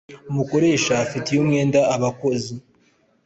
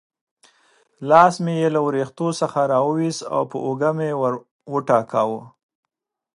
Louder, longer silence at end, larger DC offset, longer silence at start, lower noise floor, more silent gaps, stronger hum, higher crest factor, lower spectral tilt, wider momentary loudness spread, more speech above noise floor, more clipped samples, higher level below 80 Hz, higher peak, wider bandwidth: about the same, -20 LUFS vs -20 LUFS; second, 0.65 s vs 0.9 s; neither; second, 0.1 s vs 1 s; about the same, -60 dBFS vs -60 dBFS; second, none vs 4.51-4.59 s; neither; second, 16 dB vs 22 dB; about the same, -5.5 dB/octave vs -6 dB/octave; about the same, 10 LU vs 11 LU; about the same, 41 dB vs 40 dB; neither; first, -56 dBFS vs -70 dBFS; second, -6 dBFS vs 0 dBFS; second, 8.2 kHz vs 11.5 kHz